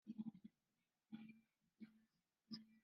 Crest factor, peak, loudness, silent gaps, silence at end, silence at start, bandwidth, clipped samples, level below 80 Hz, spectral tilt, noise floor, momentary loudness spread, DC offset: 22 dB; -40 dBFS; -60 LUFS; none; 0.05 s; 0.05 s; 5.8 kHz; under 0.1%; under -90 dBFS; -5.5 dB/octave; under -90 dBFS; 12 LU; under 0.1%